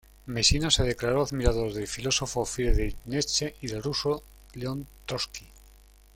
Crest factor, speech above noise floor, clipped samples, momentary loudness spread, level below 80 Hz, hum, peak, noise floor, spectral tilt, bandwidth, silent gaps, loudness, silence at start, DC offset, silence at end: 22 dB; 27 dB; under 0.1%; 12 LU; -36 dBFS; none; -6 dBFS; -54 dBFS; -3.5 dB/octave; 16.5 kHz; none; -28 LUFS; 0.25 s; under 0.1%; 0.75 s